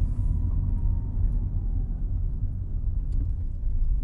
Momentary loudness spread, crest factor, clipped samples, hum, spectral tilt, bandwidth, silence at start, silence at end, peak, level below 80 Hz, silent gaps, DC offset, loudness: 4 LU; 10 dB; under 0.1%; none; -11.5 dB/octave; 1.3 kHz; 0 s; 0 s; -14 dBFS; -26 dBFS; none; under 0.1%; -30 LUFS